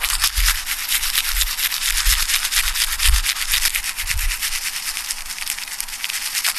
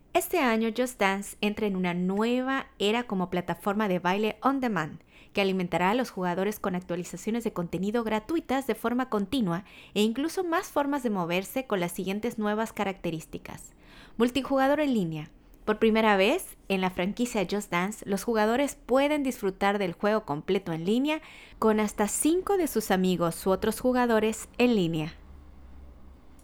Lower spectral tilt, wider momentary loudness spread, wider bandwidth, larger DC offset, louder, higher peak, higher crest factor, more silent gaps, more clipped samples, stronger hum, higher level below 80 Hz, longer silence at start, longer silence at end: second, 1.5 dB/octave vs -5 dB/octave; about the same, 8 LU vs 8 LU; second, 14 kHz vs over 20 kHz; neither; first, -19 LUFS vs -28 LUFS; first, 0 dBFS vs -10 dBFS; about the same, 20 dB vs 18 dB; neither; neither; neither; first, -28 dBFS vs -54 dBFS; second, 0 s vs 0.15 s; about the same, 0 s vs 0.05 s